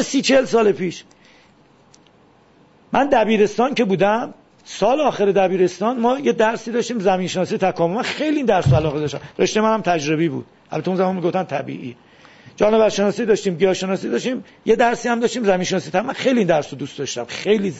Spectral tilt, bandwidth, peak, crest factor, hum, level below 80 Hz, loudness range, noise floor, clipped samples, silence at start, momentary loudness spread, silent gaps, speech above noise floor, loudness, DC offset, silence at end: -5.5 dB/octave; 8 kHz; -2 dBFS; 16 dB; none; -50 dBFS; 3 LU; -53 dBFS; under 0.1%; 0 s; 10 LU; none; 34 dB; -19 LUFS; under 0.1%; 0 s